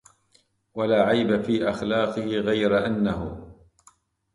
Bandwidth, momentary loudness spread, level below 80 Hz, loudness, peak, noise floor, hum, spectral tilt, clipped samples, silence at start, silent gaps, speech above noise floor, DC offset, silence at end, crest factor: 11.5 kHz; 12 LU; -50 dBFS; -24 LUFS; -8 dBFS; -64 dBFS; none; -6.5 dB/octave; under 0.1%; 0.75 s; none; 42 dB; under 0.1%; 0.8 s; 18 dB